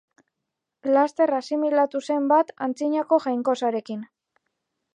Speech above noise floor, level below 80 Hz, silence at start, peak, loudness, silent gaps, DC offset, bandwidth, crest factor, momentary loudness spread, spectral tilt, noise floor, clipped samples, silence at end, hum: 61 dB; -82 dBFS; 0.85 s; -6 dBFS; -23 LUFS; none; under 0.1%; 9.8 kHz; 18 dB; 9 LU; -5 dB/octave; -83 dBFS; under 0.1%; 0.9 s; none